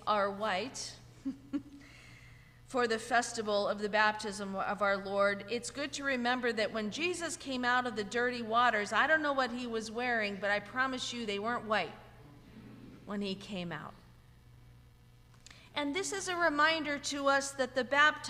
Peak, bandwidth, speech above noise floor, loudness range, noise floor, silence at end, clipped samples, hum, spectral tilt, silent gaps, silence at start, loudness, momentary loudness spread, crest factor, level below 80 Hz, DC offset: -14 dBFS; 15.5 kHz; 26 dB; 9 LU; -59 dBFS; 0 s; under 0.1%; none; -3 dB/octave; none; 0 s; -33 LUFS; 14 LU; 20 dB; -64 dBFS; under 0.1%